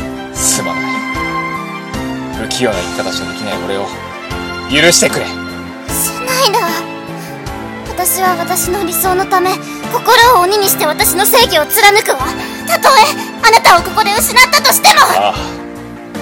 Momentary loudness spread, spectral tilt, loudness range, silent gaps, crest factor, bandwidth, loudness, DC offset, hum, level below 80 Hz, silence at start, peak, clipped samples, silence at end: 17 LU; -2 dB/octave; 9 LU; none; 12 dB; over 20 kHz; -11 LUFS; under 0.1%; none; -36 dBFS; 0 s; 0 dBFS; 0.7%; 0 s